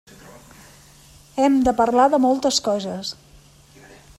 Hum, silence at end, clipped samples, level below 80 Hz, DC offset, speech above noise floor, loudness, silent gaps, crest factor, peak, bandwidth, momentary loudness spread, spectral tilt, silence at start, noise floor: none; 1.05 s; under 0.1%; -48 dBFS; under 0.1%; 31 dB; -19 LUFS; none; 16 dB; -4 dBFS; 13.5 kHz; 15 LU; -4 dB/octave; 1.35 s; -50 dBFS